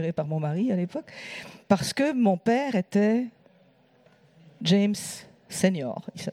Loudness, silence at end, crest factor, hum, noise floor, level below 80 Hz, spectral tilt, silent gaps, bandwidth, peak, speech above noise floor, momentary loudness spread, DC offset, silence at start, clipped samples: -26 LUFS; 0 s; 18 dB; none; -60 dBFS; -66 dBFS; -5.5 dB/octave; none; 15 kHz; -8 dBFS; 35 dB; 15 LU; under 0.1%; 0 s; under 0.1%